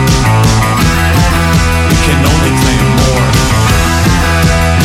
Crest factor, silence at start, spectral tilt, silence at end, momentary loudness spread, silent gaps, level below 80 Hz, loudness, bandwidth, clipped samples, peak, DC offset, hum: 8 dB; 0 s; -5 dB/octave; 0 s; 1 LU; none; -16 dBFS; -9 LUFS; 16.5 kHz; under 0.1%; 0 dBFS; under 0.1%; none